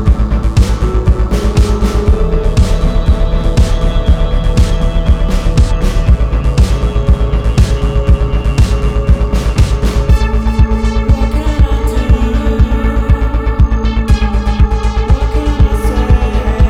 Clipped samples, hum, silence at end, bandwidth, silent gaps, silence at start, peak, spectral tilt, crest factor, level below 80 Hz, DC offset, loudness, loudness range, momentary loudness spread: 0.2%; none; 0 s; 11 kHz; none; 0 s; 0 dBFS; -7 dB/octave; 10 dB; -10 dBFS; under 0.1%; -13 LUFS; 0 LU; 2 LU